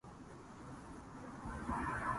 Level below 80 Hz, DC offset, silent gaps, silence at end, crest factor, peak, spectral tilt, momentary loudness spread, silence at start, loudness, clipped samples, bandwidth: -56 dBFS; under 0.1%; none; 0 s; 18 dB; -28 dBFS; -6 dB/octave; 14 LU; 0.05 s; -46 LUFS; under 0.1%; 11.5 kHz